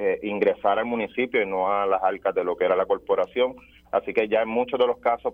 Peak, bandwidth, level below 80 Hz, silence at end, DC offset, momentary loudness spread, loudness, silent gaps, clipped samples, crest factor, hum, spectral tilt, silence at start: -8 dBFS; 4.2 kHz; -58 dBFS; 0 s; under 0.1%; 4 LU; -24 LUFS; none; under 0.1%; 16 dB; none; -7 dB/octave; 0 s